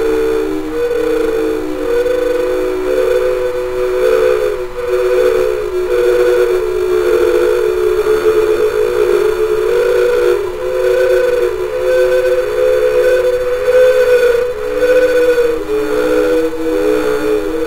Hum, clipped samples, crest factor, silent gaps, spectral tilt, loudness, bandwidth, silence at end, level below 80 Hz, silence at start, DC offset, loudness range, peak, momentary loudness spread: none; under 0.1%; 10 dB; none; -4.5 dB/octave; -13 LUFS; 16 kHz; 0 s; -32 dBFS; 0 s; under 0.1%; 3 LU; -2 dBFS; 6 LU